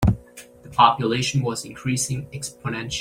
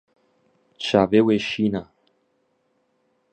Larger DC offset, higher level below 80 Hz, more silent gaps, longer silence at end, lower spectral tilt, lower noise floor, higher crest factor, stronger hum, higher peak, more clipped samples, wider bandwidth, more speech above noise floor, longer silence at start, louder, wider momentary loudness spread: neither; first, -40 dBFS vs -58 dBFS; neither; second, 0 s vs 1.5 s; second, -4.5 dB/octave vs -6 dB/octave; second, -45 dBFS vs -68 dBFS; about the same, 20 dB vs 22 dB; neither; about the same, -2 dBFS vs -2 dBFS; neither; first, 16.5 kHz vs 8.8 kHz; second, 23 dB vs 49 dB; second, 0 s vs 0.8 s; about the same, -23 LUFS vs -21 LUFS; about the same, 14 LU vs 12 LU